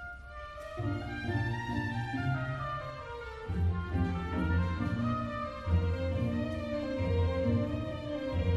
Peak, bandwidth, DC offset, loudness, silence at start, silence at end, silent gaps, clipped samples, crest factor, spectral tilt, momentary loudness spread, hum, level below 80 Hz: -18 dBFS; 7.6 kHz; under 0.1%; -34 LUFS; 0 s; 0 s; none; under 0.1%; 16 dB; -8 dB/octave; 10 LU; none; -42 dBFS